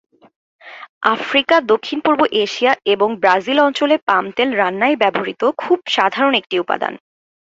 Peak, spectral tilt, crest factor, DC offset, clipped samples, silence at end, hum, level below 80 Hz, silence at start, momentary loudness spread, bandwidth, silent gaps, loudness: 0 dBFS; -4 dB/octave; 16 dB; under 0.1%; under 0.1%; 0.55 s; none; -62 dBFS; 0.65 s; 6 LU; 8 kHz; 0.89-1.01 s, 4.02-4.07 s; -16 LUFS